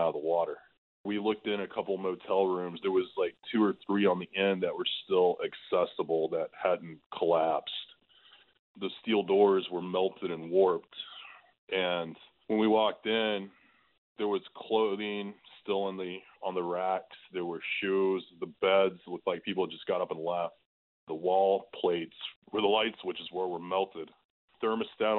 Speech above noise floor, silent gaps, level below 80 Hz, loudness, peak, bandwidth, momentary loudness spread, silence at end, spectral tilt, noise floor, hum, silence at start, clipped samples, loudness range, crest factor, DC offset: 30 dB; 0.78-1.04 s, 7.06-7.10 s, 8.59-8.75 s, 11.58-11.67 s, 13.98-14.15 s, 20.66-21.07 s, 22.36-22.42 s, 24.25-24.48 s; -76 dBFS; -31 LUFS; -14 dBFS; 4.4 kHz; 13 LU; 0 s; -8.5 dB/octave; -61 dBFS; none; 0 s; under 0.1%; 4 LU; 18 dB; under 0.1%